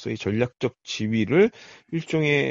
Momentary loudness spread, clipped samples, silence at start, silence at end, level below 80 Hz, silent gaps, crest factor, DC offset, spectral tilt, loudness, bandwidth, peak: 10 LU; under 0.1%; 0 s; 0 s; -58 dBFS; none; 18 dB; under 0.1%; -5 dB/octave; -24 LUFS; 8 kHz; -6 dBFS